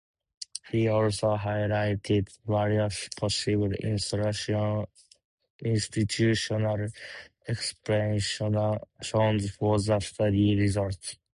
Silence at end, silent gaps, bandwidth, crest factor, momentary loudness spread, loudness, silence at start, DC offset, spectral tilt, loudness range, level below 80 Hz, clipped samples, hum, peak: 0.25 s; 5.25-5.38 s, 5.50-5.59 s; 11 kHz; 16 dB; 10 LU; -28 LUFS; 0.4 s; under 0.1%; -5.5 dB/octave; 3 LU; -50 dBFS; under 0.1%; none; -12 dBFS